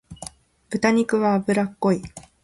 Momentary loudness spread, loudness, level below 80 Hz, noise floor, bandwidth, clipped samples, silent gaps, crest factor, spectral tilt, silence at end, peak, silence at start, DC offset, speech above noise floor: 19 LU; -22 LUFS; -54 dBFS; -42 dBFS; 11.5 kHz; under 0.1%; none; 16 dB; -6 dB/octave; 0.25 s; -8 dBFS; 0.1 s; under 0.1%; 21 dB